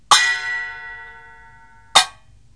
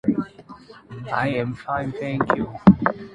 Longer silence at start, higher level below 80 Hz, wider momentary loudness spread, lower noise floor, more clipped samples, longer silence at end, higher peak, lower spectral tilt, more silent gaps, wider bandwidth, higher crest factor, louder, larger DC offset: about the same, 0.1 s vs 0.05 s; second, -54 dBFS vs -46 dBFS; first, 22 LU vs 17 LU; first, -48 dBFS vs -44 dBFS; neither; first, 0.45 s vs 0 s; about the same, 0 dBFS vs 0 dBFS; second, 2 dB/octave vs -9 dB/octave; neither; first, 11 kHz vs 5.4 kHz; about the same, 22 dB vs 22 dB; first, -17 LUFS vs -22 LUFS; first, 0.3% vs under 0.1%